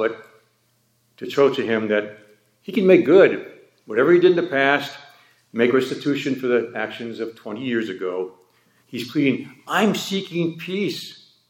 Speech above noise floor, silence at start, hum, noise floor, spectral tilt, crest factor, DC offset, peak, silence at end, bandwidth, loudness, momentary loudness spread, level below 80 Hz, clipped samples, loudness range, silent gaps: 45 dB; 0 s; none; -64 dBFS; -5.5 dB/octave; 20 dB; under 0.1%; -2 dBFS; 0.35 s; 17 kHz; -20 LUFS; 17 LU; -76 dBFS; under 0.1%; 7 LU; none